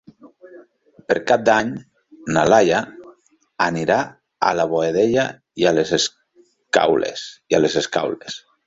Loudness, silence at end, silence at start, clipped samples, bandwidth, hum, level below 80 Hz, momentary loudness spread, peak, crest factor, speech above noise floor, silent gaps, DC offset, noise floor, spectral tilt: -19 LUFS; 0.3 s; 0.25 s; under 0.1%; 8 kHz; none; -56 dBFS; 14 LU; -2 dBFS; 18 dB; 39 dB; none; under 0.1%; -57 dBFS; -4 dB/octave